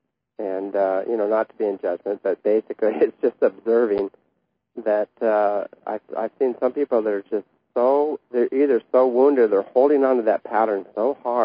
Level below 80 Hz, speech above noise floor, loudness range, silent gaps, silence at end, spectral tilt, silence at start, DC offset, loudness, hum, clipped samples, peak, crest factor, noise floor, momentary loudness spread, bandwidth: -72 dBFS; 51 dB; 4 LU; none; 0 s; -10.5 dB/octave; 0.4 s; under 0.1%; -21 LUFS; none; under 0.1%; -6 dBFS; 16 dB; -72 dBFS; 12 LU; 5.2 kHz